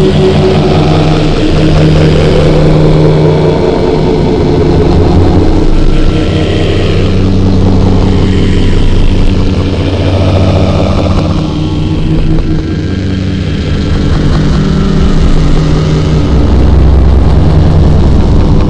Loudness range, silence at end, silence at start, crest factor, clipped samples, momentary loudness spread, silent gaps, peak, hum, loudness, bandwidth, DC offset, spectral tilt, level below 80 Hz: 4 LU; 0 s; 0 s; 6 dB; 0.2%; 5 LU; none; 0 dBFS; none; -8 LUFS; 9.2 kHz; under 0.1%; -7.5 dB/octave; -10 dBFS